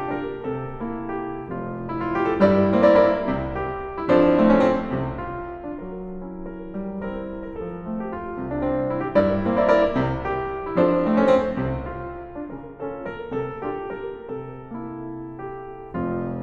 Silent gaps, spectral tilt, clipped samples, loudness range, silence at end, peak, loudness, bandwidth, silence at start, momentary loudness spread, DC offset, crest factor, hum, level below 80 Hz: none; -8.5 dB/octave; under 0.1%; 13 LU; 0 s; -4 dBFS; -23 LUFS; 7.2 kHz; 0 s; 17 LU; under 0.1%; 20 dB; none; -42 dBFS